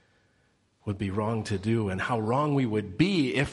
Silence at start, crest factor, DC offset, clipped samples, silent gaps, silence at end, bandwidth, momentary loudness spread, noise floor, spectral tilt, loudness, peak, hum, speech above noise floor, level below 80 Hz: 0.85 s; 18 dB; under 0.1%; under 0.1%; none; 0 s; 11.5 kHz; 7 LU; -68 dBFS; -6.5 dB/octave; -28 LUFS; -10 dBFS; none; 41 dB; -56 dBFS